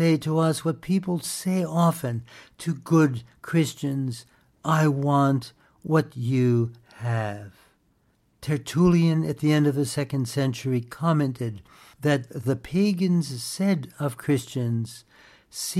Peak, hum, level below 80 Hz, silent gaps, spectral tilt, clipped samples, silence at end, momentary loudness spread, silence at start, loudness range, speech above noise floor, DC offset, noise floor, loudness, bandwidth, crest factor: -8 dBFS; none; -58 dBFS; none; -6.5 dB/octave; under 0.1%; 0 s; 12 LU; 0 s; 2 LU; 42 dB; under 0.1%; -66 dBFS; -25 LUFS; 15 kHz; 16 dB